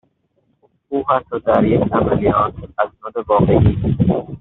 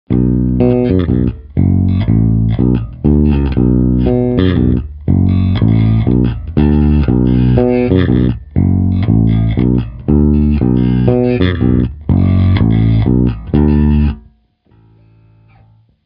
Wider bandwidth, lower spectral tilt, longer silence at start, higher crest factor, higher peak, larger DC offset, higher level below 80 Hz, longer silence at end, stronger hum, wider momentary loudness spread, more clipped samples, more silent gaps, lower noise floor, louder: second, 4.1 kHz vs 5.2 kHz; second, -8 dB/octave vs -12.5 dB/octave; first, 0.9 s vs 0.1 s; about the same, 16 dB vs 12 dB; about the same, -2 dBFS vs 0 dBFS; neither; second, -34 dBFS vs -20 dBFS; second, 0 s vs 1.85 s; neither; first, 9 LU vs 4 LU; neither; neither; first, -64 dBFS vs -51 dBFS; second, -17 LUFS vs -12 LUFS